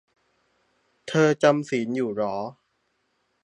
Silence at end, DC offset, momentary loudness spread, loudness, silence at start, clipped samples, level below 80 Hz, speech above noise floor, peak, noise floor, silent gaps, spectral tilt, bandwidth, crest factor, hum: 0.9 s; under 0.1%; 15 LU; -24 LUFS; 1.05 s; under 0.1%; -72 dBFS; 50 dB; -4 dBFS; -72 dBFS; none; -6 dB/octave; 10.5 kHz; 22 dB; none